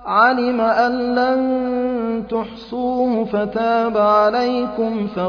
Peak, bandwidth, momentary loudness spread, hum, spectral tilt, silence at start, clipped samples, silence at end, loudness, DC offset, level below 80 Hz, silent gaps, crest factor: -2 dBFS; 5.4 kHz; 8 LU; none; -7 dB/octave; 0 s; under 0.1%; 0 s; -18 LUFS; under 0.1%; -50 dBFS; none; 16 dB